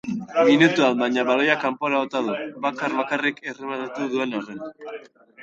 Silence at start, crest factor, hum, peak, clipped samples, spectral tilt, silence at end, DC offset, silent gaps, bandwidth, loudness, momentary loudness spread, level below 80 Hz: 0.05 s; 18 dB; none; -4 dBFS; under 0.1%; -5 dB/octave; 0 s; under 0.1%; none; 8 kHz; -22 LUFS; 19 LU; -68 dBFS